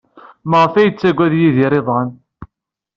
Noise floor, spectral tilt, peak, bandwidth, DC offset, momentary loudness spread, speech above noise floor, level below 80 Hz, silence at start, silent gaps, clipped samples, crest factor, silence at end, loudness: -78 dBFS; -6 dB/octave; -2 dBFS; 7.2 kHz; under 0.1%; 8 LU; 65 dB; -52 dBFS; 0.45 s; none; under 0.1%; 14 dB; 0.5 s; -14 LUFS